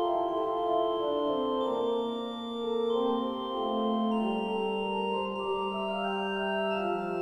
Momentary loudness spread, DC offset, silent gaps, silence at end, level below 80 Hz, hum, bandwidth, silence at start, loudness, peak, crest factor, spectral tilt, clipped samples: 4 LU; under 0.1%; none; 0 s; -64 dBFS; none; 8.8 kHz; 0 s; -30 LUFS; -18 dBFS; 12 dB; -6.5 dB/octave; under 0.1%